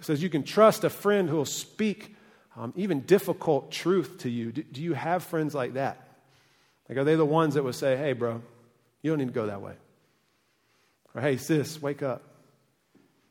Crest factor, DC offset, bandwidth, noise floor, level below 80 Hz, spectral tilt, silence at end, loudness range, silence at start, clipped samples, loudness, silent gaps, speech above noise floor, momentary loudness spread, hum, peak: 22 dB; under 0.1%; 17.5 kHz; -70 dBFS; -74 dBFS; -6 dB/octave; 1.1 s; 7 LU; 0 s; under 0.1%; -27 LUFS; none; 43 dB; 13 LU; none; -6 dBFS